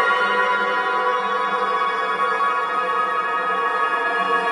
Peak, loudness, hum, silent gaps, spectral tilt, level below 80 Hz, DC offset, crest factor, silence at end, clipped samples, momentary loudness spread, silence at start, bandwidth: -6 dBFS; -20 LUFS; none; none; -3 dB/octave; -78 dBFS; under 0.1%; 16 dB; 0 s; under 0.1%; 3 LU; 0 s; 11.5 kHz